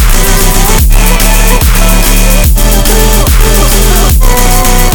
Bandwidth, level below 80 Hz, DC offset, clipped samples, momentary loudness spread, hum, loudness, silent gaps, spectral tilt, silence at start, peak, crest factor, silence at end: over 20 kHz; -6 dBFS; under 0.1%; 5%; 1 LU; none; -7 LUFS; none; -3.5 dB/octave; 0 s; 0 dBFS; 4 dB; 0 s